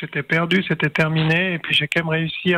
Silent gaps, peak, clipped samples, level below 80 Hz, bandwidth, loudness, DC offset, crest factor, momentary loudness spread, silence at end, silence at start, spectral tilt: none; -6 dBFS; under 0.1%; -54 dBFS; 10 kHz; -19 LUFS; under 0.1%; 14 dB; 3 LU; 0 s; 0 s; -6 dB/octave